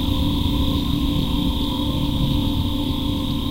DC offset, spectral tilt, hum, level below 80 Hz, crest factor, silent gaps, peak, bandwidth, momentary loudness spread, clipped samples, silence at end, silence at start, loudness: under 0.1%; -6.5 dB/octave; none; -26 dBFS; 14 dB; none; -6 dBFS; 16 kHz; 2 LU; under 0.1%; 0 s; 0 s; -22 LUFS